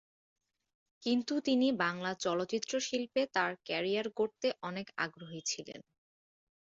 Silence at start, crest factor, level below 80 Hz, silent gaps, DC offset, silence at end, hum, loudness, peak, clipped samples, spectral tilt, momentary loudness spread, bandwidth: 1 s; 18 dB; -78 dBFS; none; under 0.1%; 0.85 s; none; -34 LUFS; -18 dBFS; under 0.1%; -3.5 dB/octave; 10 LU; 7.8 kHz